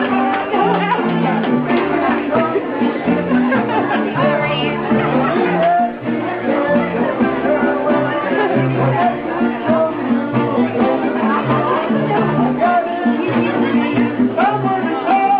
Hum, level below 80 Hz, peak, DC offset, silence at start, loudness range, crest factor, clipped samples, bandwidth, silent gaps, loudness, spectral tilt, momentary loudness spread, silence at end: none; -50 dBFS; -4 dBFS; under 0.1%; 0 s; 1 LU; 12 dB; under 0.1%; 5 kHz; none; -16 LUFS; -10 dB/octave; 3 LU; 0 s